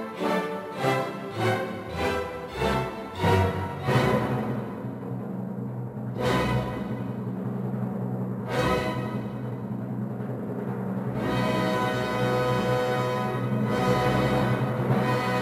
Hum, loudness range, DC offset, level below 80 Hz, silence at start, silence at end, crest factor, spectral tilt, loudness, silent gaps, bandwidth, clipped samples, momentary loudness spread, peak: none; 5 LU; under 0.1%; -46 dBFS; 0 s; 0 s; 16 dB; -6.5 dB/octave; -27 LUFS; none; 16 kHz; under 0.1%; 9 LU; -10 dBFS